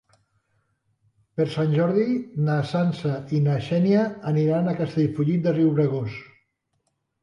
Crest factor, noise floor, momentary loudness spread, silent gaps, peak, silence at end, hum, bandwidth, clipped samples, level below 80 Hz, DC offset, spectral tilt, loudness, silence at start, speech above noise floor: 14 dB; -74 dBFS; 7 LU; none; -10 dBFS; 1 s; none; 7.2 kHz; under 0.1%; -62 dBFS; under 0.1%; -9 dB/octave; -23 LUFS; 1.35 s; 52 dB